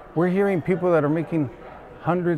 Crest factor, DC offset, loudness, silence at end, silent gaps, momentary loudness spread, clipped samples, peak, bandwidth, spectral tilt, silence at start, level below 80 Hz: 14 dB; under 0.1%; -23 LUFS; 0 s; none; 12 LU; under 0.1%; -8 dBFS; 10.5 kHz; -9.5 dB/octave; 0 s; -54 dBFS